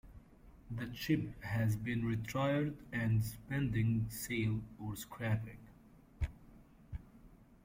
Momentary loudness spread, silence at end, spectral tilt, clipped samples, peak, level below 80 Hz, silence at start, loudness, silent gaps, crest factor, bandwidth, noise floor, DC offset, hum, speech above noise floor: 13 LU; 0.1 s; -6.5 dB/octave; under 0.1%; -20 dBFS; -54 dBFS; 0.05 s; -38 LUFS; none; 18 dB; 16.5 kHz; -61 dBFS; under 0.1%; none; 25 dB